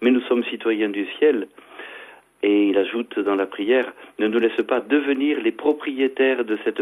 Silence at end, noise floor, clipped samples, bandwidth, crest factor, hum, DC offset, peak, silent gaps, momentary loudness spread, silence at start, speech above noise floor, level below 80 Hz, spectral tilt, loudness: 0 s; -43 dBFS; under 0.1%; 11.5 kHz; 16 dB; none; under 0.1%; -6 dBFS; none; 10 LU; 0 s; 23 dB; -70 dBFS; -6 dB/octave; -21 LUFS